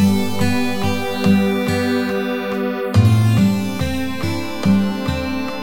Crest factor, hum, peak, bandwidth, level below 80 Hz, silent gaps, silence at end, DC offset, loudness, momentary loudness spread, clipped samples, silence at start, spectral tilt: 16 dB; none; -2 dBFS; 17 kHz; -40 dBFS; none; 0 s; under 0.1%; -18 LUFS; 8 LU; under 0.1%; 0 s; -6.5 dB/octave